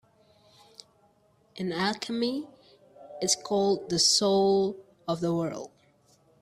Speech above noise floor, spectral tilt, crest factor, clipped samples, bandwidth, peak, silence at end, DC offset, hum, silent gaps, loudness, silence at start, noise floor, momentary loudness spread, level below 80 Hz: 38 dB; -3.5 dB/octave; 18 dB; under 0.1%; 15 kHz; -10 dBFS; 0.75 s; under 0.1%; none; none; -27 LUFS; 1.55 s; -65 dBFS; 18 LU; -68 dBFS